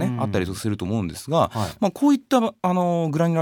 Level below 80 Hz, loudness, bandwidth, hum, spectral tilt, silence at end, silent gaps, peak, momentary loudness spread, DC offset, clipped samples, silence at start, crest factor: -52 dBFS; -22 LUFS; 19 kHz; none; -6.5 dB/octave; 0 s; none; -6 dBFS; 7 LU; under 0.1%; under 0.1%; 0 s; 16 dB